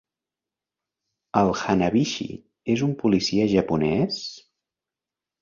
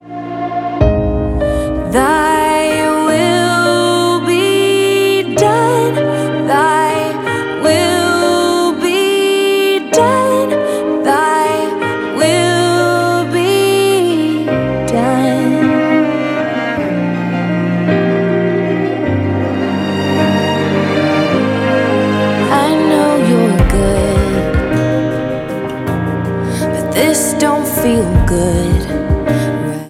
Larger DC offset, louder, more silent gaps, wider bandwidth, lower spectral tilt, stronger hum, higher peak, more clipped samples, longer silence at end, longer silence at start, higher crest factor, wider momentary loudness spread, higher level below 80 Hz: neither; second, -23 LUFS vs -13 LUFS; neither; second, 7.4 kHz vs 17 kHz; about the same, -6 dB/octave vs -5.5 dB/octave; neither; second, -6 dBFS vs 0 dBFS; neither; first, 1 s vs 0 s; first, 1.35 s vs 0.05 s; first, 20 dB vs 12 dB; first, 10 LU vs 5 LU; second, -52 dBFS vs -26 dBFS